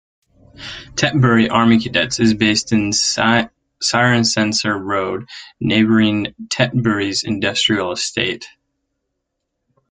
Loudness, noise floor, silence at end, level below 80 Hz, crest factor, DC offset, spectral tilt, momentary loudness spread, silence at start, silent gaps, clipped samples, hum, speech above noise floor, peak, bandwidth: -16 LUFS; -75 dBFS; 1.45 s; -50 dBFS; 16 dB; under 0.1%; -4 dB/octave; 11 LU; 0.6 s; none; under 0.1%; none; 59 dB; -2 dBFS; 9.6 kHz